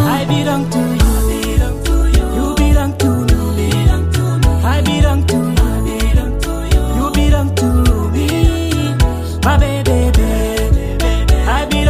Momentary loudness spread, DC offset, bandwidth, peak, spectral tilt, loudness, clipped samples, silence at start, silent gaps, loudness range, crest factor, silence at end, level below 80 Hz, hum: 3 LU; under 0.1%; 16 kHz; 0 dBFS; -6 dB/octave; -14 LUFS; under 0.1%; 0 s; none; 1 LU; 12 dB; 0 s; -16 dBFS; none